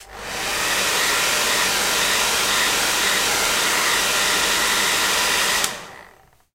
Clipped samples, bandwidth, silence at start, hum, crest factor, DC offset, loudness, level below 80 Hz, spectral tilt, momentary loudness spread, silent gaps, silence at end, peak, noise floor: under 0.1%; 16 kHz; 0 s; none; 18 dB; under 0.1%; -18 LUFS; -48 dBFS; 0.5 dB/octave; 4 LU; none; 0.5 s; -2 dBFS; -51 dBFS